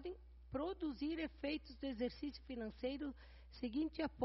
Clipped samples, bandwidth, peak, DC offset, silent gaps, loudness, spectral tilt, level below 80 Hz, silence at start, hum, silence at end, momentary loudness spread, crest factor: under 0.1%; 5.8 kHz; -26 dBFS; under 0.1%; none; -45 LUFS; -4.5 dB/octave; -60 dBFS; 0 s; none; 0 s; 8 LU; 18 dB